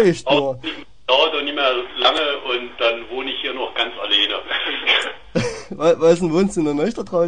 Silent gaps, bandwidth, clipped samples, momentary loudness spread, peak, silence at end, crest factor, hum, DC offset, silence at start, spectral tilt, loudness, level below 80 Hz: none; 10 kHz; under 0.1%; 8 LU; -2 dBFS; 0 s; 18 dB; none; 0.9%; 0 s; -4.5 dB/octave; -19 LUFS; -50 dBFS